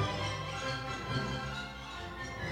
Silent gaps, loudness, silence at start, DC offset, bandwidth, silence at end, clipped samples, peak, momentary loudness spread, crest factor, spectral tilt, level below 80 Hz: none; -37 LUFS; 0 s; under 0.1%; 16 kHz; 0 s; under 0.1%; -22 dBFS; 7 LU; 16 dB; -4.5 dB/octave; -50 dBFS